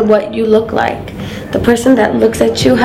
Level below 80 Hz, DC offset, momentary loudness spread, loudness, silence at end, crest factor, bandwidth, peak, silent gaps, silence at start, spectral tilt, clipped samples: -36 dBFS; under 0.1%; 12 LU; -12 LUFS; 0 s; 12 dB; 16 kHz; 0 dBFS; none; 0 s; -5.5 dB/octave; 0.6%